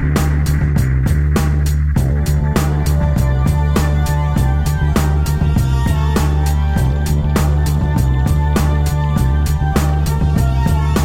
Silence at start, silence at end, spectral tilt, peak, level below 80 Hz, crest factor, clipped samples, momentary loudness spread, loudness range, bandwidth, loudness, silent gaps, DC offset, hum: 0 s; 0 s; -6.5 dB/octave; -4 dBFS; -16 dBFS; 10 dB; under 0.1%; 1 LU; 0 LU; 16.5 kHz; -16 LUFS; none; under 0.1%; none